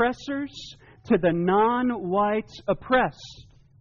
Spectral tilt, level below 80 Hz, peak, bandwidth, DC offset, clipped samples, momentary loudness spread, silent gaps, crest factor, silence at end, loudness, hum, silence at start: -4.5 dB/octave; -52 dBFS; -10 dBFS; 7.2 kHz; under 0.1%; under 0.1%; 19 LU; none; 14 dB; 0.4 s; -24 LUFS; none; 0 s